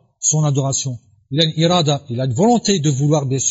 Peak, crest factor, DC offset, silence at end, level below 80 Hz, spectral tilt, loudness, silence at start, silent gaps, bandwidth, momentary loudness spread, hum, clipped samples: -4 dBFS; 14 dB; under 0.1%; 0 s; -58 dBFS; -4.5 dB/octave; -17 LUFS; 0.2 s; none; 8 kHz; 7 LU; none; under 0.1%